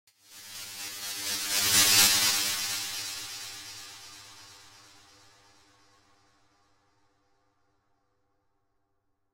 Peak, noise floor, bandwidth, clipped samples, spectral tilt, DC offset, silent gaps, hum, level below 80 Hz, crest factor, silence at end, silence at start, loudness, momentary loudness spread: -8 dBFS; -75 dBFS; 16 kHz; under 0.1%; 1 dB/octave; under 0.1%; none; none; -66 dBFS; 24 dB; 4.75 s; 0.3 s; -24 LUFS; 26 LU